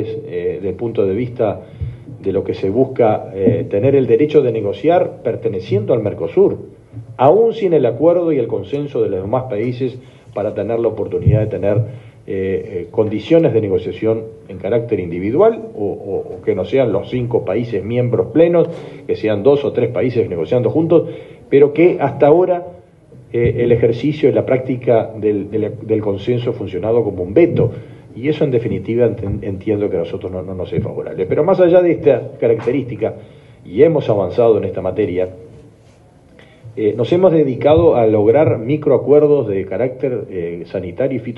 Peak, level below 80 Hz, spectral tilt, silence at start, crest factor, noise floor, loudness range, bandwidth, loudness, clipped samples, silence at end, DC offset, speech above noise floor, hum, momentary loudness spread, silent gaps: 0 dBFS; -44 dBFS; -9.5 dB/octave; 0 s; 16 dB; -46 dBFS; 4 LU; 5.8 kHz; -16 LUFS; under 0.1%; 0 s; under 0.1%; 31 dB; none; 12 LU; none